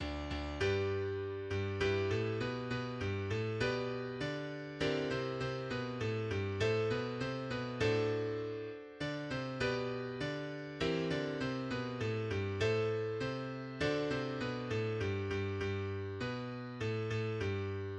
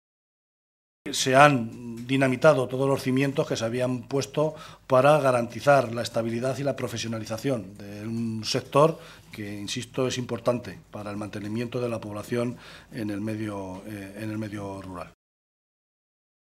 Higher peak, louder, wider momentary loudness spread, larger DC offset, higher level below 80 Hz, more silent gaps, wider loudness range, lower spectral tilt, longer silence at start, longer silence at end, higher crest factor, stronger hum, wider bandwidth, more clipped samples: second, -20 dBFS vs 0 dBFS; second, -37 LUFS vs -26 LUFS; second, 6 LU vs 18 LU; neither; first, -56 dBFS vs -62 dBFS; neither; second, 2 LU vs 10 LU; first, -6.5 dB/octave vs -5 dB/octave; second, 0 s vs 1.05 s; second, 0 s vs 1.45 s; second, 16 dB vs 26 dB; neither; second, 9.4 kHz vs 15 kHz; neither